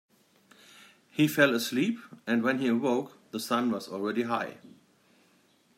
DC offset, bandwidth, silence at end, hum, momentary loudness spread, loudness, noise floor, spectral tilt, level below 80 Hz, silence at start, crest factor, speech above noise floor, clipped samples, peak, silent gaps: under 0.1%; 16 kHz; 1.1 s; none; 14 LU; -29 LUFS; -65 dBFS; -5 dB/octave; -78 dBFS; 1.15 s; 22 dB; 37 dB; under 0.1%; -8 dBFS; none